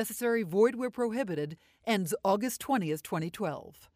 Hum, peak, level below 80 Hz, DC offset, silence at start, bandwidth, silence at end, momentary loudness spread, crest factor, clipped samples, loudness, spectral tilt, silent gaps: none; -14 dBFS; -70 dBFS; under 0.1%; 0 s; 15.5 kHz; 0.25 s; 9 LU; 18 dB; under 0.1%; -31 LUFS; -5 dB/octave; none